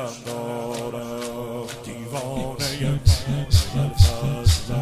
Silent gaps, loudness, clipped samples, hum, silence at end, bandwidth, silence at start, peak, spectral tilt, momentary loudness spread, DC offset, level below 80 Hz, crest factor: none; -24 LUFS; under 0.1%; none; 0 s; 15.5 kHz; 0 s; -2 dBFS; -5.5 dB/octave; 12 LU; under 0.1%; -28 dBFS; 20 dB